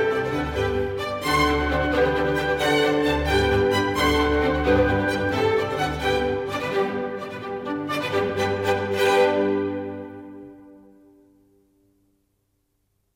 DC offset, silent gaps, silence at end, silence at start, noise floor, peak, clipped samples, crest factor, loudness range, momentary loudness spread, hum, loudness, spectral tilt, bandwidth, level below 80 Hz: under 0.1%; none; 2.4 s; 0 s; -71 dBFS; -8 dBFS; under 0.1%; 14 dB; 5 LU; 11 LU; none; -22 LUFS; -5.5 dB/octave; 17 kHz; -38 dBFS